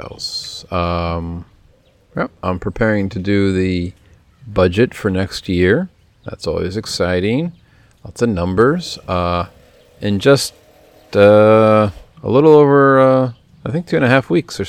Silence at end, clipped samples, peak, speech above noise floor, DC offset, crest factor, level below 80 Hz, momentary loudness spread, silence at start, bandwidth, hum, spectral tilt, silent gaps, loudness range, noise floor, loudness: 0 s; under 0.1%; 0 dBFS; 37 dB; under 0.1%; 16 dB; -44 dBFS; 15 LU; 0 s; 14.5 kHz; none; -6.5 dB/octave; none; 8 LU; -52 dBFS; -15 LUFS